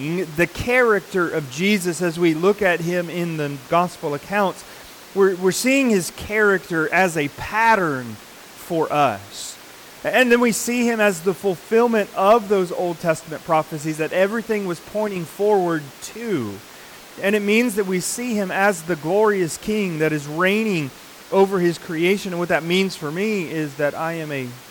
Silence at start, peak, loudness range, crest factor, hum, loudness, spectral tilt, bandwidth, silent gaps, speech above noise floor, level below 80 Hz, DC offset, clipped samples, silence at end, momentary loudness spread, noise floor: 0 s; -6 dBFS; 4 LU; 16 dB; none; -20 LUFS; -4.5 dB/octave; 19 kHz; none; 21 dB; -54 dBFS; under 0.1%; under 0.1%; 0 s; 12 LU; -42 dBFS